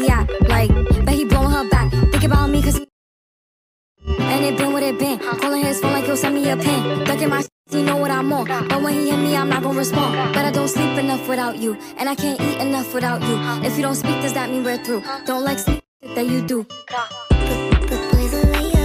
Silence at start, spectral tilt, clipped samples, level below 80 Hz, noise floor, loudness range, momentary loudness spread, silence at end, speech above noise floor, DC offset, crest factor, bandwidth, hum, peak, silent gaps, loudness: 0 s; -5.5 dB/octave; under 0.1%; -24 dBFS; under -90 dBFS; 3 LU; 8 LU; 0 s; over 70 dB; under 0.1%; 14 dB; 16 kHz; none; -4 dBFS; 2.92-3.95 s, 7.52-7.64 s, 15.88-16.00 s; -19 LUFS